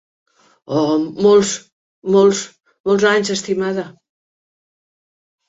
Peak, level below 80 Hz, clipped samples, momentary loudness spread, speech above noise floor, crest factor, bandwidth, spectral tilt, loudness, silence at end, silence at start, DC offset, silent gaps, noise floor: -2 dBFS; -60 dBFS; under 0.1%; 14 LU; over 75 dB; 16 dB; 8 kHz; -4.5 dB/octave; -16 LUFS; 1.6 s; 0.7 s; under 0.1%; 1.72-2.02 s, 2.80-2.84 s; under -90 dBFS